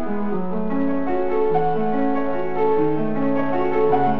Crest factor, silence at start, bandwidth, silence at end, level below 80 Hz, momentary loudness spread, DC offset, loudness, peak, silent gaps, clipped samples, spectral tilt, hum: 16 dB; 0 s; 5.6 kHz; 0 s; -46 dBFS; 5 LU; 7%; -22 LUFS; -6 dBFS; none; under 0.1%; -9.5 dB/octave; none